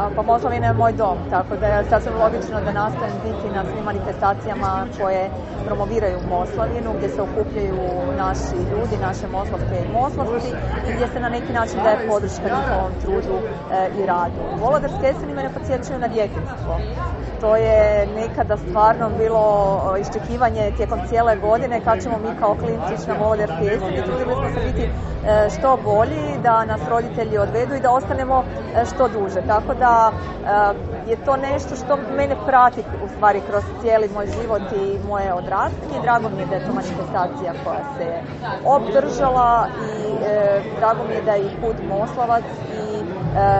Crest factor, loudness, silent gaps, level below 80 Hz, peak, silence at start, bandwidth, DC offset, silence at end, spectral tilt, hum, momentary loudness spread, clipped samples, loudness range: 18 dB; -20 LUFS; none; -34 dBFS; -2 dBFS; 0 s; 8.2 kHz; under 0.1%; 0 s; -7 dB/octave; none; 8 LU; under 0.1%; 4 LU